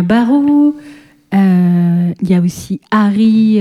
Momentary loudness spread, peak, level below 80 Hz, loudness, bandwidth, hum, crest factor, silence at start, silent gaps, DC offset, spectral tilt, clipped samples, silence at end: 7 LU; 0 dBFS; -50 dBFS; -12 LUFS; 12.5 kHz; none; 10 dB; 0 s; none; under 0.1%; -8 dB/octave; under 0.1%; 0 s